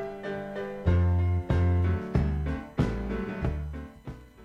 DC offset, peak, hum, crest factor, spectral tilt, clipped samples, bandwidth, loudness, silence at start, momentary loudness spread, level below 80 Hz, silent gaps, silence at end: under 0.1%; -12 dBFS; none; 16 dB; -9 dB/octave; under 0.1%; 6 kHz; -29 LUFS; 0 s; 14 LU; -36 dBFS; none; 0 s